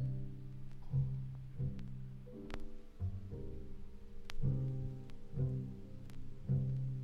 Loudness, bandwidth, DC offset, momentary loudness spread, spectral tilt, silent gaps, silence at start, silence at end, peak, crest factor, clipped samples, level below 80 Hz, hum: -43 LUFS; 6 kHz; under 0.1%; 15 LU; -9 dB/octave; none; 0 s; 0 s; -24 dBFS; 16 dB; under 0.1%; -48 dBFS; none